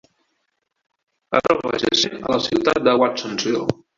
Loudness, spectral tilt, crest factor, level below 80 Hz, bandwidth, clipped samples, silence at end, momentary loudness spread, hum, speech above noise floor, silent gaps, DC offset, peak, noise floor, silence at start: -19 LUFS; -4 dB/octave; 20 dB; -54 dBFS; 7.6 kHz; under 0.1%; 0.25 s; 5 LU; none; 54 dB; none; under 0.1%; -2 dBFS; -73 dBFS; 1.3 s